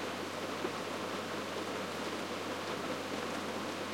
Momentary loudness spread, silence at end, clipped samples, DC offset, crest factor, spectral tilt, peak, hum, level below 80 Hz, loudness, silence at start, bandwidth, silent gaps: 1 LU; 0 s; under 0.1%; under 0.1%; 16 dB; -3.5 dB/octave; -22 dBFS; none; -78 dBFS; -38 LUFS; 0 s; 16.5 kHz; none